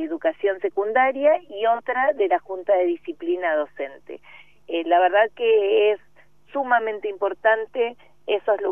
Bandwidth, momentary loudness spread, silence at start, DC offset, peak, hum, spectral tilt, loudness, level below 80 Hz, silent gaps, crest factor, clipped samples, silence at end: 3.6 kHz; 12 LU; 0 s; 0.3%; -4 dBFS; none; -5.5 dB/octave; -22 LUFS; -70 dBFS; none; 18 dB; under 0.1%; 0 s